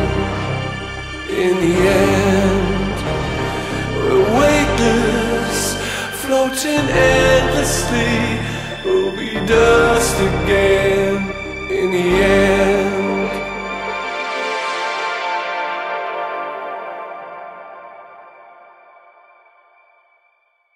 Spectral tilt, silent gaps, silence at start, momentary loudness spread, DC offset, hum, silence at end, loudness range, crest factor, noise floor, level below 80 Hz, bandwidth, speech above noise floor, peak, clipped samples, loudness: -4.5 dB/octave; none; 0 s; 12 LU; under 0.1%; none; 2.45 s; 10 LU; 16 dB; -61 dBFS; -32 dBFS; 16 kHz; 47 dB; 0 dBFS; under 0.1%; -17 LUFS